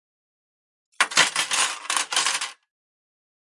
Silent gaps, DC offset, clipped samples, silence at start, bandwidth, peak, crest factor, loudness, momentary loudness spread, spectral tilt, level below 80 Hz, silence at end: none; under 0.1%; under 0.1%; 1 s; 11.5 kHz; -4 dBFS; 24 dB; -21 LUFS; 7 LU; 1.5 dB/octave; -78 dBFS; 1.05 s